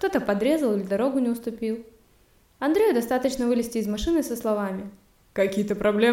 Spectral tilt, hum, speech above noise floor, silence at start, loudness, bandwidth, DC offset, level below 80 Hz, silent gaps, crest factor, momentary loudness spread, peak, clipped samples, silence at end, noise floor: -5.5 dB/octave; none; 36 dB; 0 s; -25 LUFS; 17 kHz; under 0.1%; -48 dBFS; none; 16 dB; 9 LU; -8 dBFS; under 0.1%; 0 s; -60 dBFS